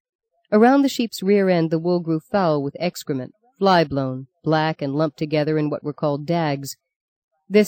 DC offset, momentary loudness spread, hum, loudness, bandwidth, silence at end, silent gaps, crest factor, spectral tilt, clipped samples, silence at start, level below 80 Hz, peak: under 0.1%; 12 LU; none; -21 LUFS; 17 kHz; 0 s; 6.96-7.29 s; 16 dB; -6.5 dB/octave; under 0.1%; 0.5 s; -62 dBFS; -4 dBFS